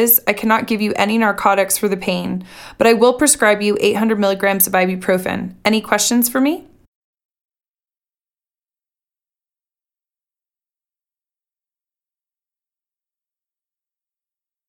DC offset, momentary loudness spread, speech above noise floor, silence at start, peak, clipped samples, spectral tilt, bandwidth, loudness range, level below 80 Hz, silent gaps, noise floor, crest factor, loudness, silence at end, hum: under 0.1%; 8 LU; over 74 dB; 0 s; 0 dBFS; under 0.1%; -3.5 dB/octave; 19 kHz; 6 LU; -54 dBFS; none; under -90 dBFS; 20 dB; -15 LUFS; 8.1 s; none